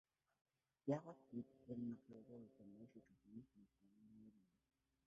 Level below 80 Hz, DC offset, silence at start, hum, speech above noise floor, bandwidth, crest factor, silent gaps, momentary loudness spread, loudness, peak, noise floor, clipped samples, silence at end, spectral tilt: -88 dBFS; under 0.1%; 0.85 s; none; 23 dB; 6.4 kHz; 24 dB; none; 20 LU; -53 LUFS; -30 dBFS; -74 dBFS; under 0.1%; 0.65 s; -9 dB/octave